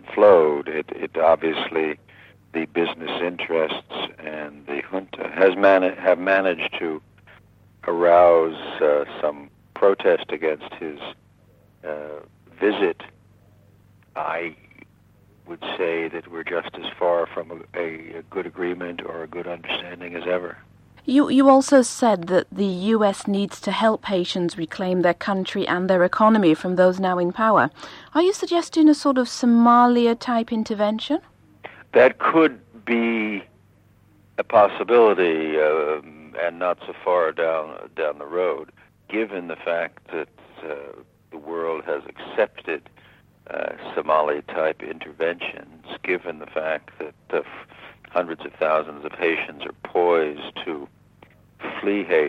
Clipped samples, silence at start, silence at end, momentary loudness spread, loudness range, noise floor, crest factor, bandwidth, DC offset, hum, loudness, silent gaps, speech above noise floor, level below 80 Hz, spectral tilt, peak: under 0.1%; 0.05 s; 0 s; 17 LU; 10 LU; -56 dBFS; 18 dB; 11.5 kHz; under 0.1%; none; -21 LUFS; none; 34 dB; -64 dBFS; -5.5 dB/octave; -4 dBFS